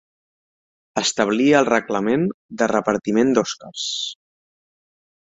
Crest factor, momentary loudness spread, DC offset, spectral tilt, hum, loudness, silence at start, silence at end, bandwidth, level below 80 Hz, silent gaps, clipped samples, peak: 20 dB; 11 LU; under 0.1%; -4 dB/octave; none; -20 LUFS; 0.95 s; 1.15 s; 8 kHz; -60 dBFS; 2.34-2.49 s; under 0.1%; -2 dBFS